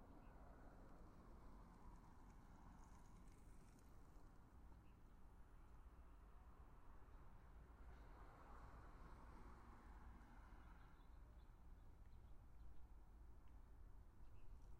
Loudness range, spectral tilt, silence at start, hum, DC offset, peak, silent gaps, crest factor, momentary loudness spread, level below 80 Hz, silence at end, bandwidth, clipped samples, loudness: 3 LU; -6.5 dB/octave; 0 s; none; under 0.1%; -48 dBFS; none; 12 dB; 4 LU; -64 dBFS; 0 s; 10.5 kHz; under 0.1%; -67 LUFS